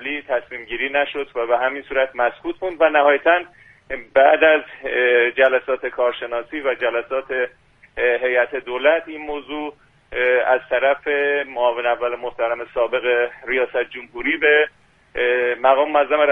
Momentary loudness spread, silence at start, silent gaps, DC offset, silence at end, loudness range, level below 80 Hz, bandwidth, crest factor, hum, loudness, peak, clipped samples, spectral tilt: 12 LU; 0 s; none; under 0.1%; 0 s; 4 LU; -54 dBFS; 3.9 kHz; 18 dB; none; -19 LUFS; 0 dBFS; under 0.1%; -5.5 dB/octave